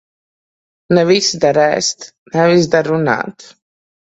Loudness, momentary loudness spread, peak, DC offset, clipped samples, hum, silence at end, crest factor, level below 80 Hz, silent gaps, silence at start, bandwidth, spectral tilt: -14 LUFS; 9 LU; 0 dBFS; under 0.1%; under 0.1%; none; 0.65 s; 16 dB; -56 dBFS; 2.18-2.26 s; 0.9 s; 8.2 kHz; -4.5 dB/octave